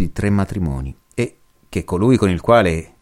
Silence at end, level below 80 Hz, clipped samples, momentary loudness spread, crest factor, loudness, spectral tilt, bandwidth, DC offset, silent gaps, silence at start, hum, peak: 0.15 s; -34 dBFS; under 0.1%; 13 LU; 16 dB; -18 LUFS; -7 dB/octave; 14.5 kHz; under 0.1%; none; 0 s; none; -2 dBFS